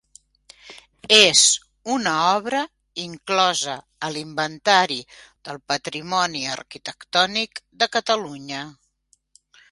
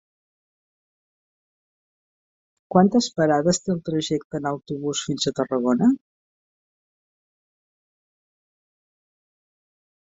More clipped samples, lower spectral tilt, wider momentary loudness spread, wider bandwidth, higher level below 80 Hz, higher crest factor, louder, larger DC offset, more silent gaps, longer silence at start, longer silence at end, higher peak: neither; second, -1 dB/octave vs -5 dB/octave; first, 18 LU vs 9 LU; first, 16 kHz vs 8 kHz; about the same, -64 dBFS vs -62 dBFS; about the same, 22 dB vs 24 dB; about the same, -20 LUFS vs -22 LUFS; neither; second, none vs 4.25-4.30 s; second, 0.65 s vs 2.7 s; second, 1 s vs 4.15 s; about the same, 0 dBFS vs -2 dBFS